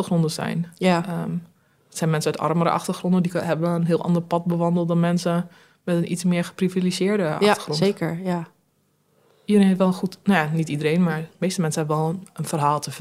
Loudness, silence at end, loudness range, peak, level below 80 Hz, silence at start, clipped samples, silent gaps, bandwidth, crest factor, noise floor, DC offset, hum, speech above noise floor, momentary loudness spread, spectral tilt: -22 LUFS; 0 s; 2 LU; -2 dBFS; -66 dBFS; 0 s; under 0.1%; none; 14.5 kHz; 20 dB; -66 dBFS; under 0.1%; none; 44 dB; 8 LU; -6 dB/octave